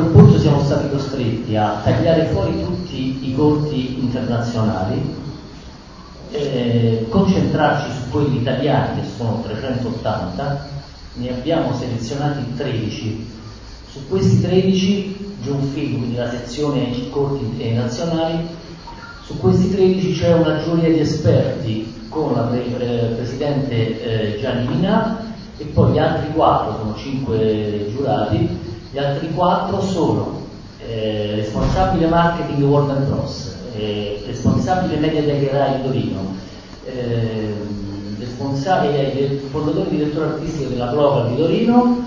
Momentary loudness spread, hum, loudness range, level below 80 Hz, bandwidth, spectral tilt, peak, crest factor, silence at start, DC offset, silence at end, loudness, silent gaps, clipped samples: 13 LU; none; 4 LU; -36 dBFS; 7.6 kHz; -7.5 dB/octave; 0 dBFS; 18 dB; 0 s; under 0.1%; 0 s; -19 LUFS; none; under 0.1%